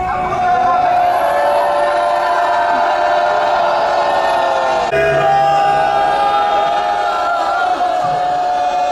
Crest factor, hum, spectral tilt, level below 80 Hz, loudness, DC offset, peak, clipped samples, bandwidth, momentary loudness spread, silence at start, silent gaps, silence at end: 10 dB; none; -4 dB/octave; -44 dBFS; -14 LUFS; under 0.1%; -4 dBFS; under 0.1%; 12 kHz; 3 LU; 0 s; none; 0 s